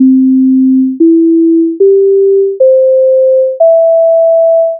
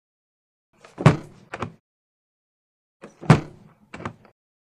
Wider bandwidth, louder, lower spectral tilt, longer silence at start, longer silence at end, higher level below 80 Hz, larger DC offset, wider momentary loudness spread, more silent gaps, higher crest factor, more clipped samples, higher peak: second, 0.8 kHz vs 11 kHz; first, -7 LUFS vs -21 LUFS; first, -11 dB/octave vs -7 dB/octave; second, 0 s vs 1 s; second, 0 s vs 0.65 s; second, -76 dBFS vs -52 dBFS; neither; second, 2 LU vs 20 LU; second, none vs 1.80-3.00 s; second, 6 dB vs 26 dB; neither; about the same, 0 dBFS vs 0 dBFS